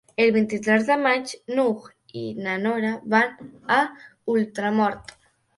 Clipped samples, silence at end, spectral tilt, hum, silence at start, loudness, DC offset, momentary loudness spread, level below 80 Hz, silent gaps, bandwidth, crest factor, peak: under 0.1%; 0.55 s; -5.5 dB/octave; none; 0.2 s; -23 LUFS; under 0.1%; 14 LU; -66 dBFS; none; 11.5 kHz; 18 dB; -4 dBFS